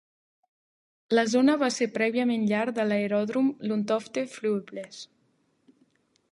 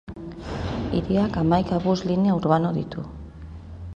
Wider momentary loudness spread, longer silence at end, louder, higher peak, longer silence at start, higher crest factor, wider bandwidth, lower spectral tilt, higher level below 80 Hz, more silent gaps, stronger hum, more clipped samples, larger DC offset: second, 16 LU vs 19 LU; first, 1.3 s vs 0 s; second, -26 LUFS vs -23 LUFS; second, -10 dBFS vs -4 dBFS; first, 1.1 s vs 0.05 s; about the same, 18 dB vs 20 dB; first, 11.5 kHz vs 7.4 kHz; second, -5 dB/octave vs -8 dB/octave; second, -78 dBFS vs -40 dBFS; neither; neither; neither; neither